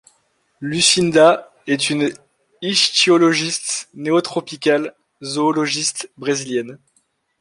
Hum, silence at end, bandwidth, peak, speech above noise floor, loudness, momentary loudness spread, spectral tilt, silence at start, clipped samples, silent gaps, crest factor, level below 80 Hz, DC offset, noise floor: none; 0.65 s; 11.5 kHz; 0 dBFS; 47 dB; -17 LUFS; 13 LU; -3 dB/octave; 0.6 s; under 0.1%; none; 18 dB; -62 dBFS; under 0.1%; -64 dBFS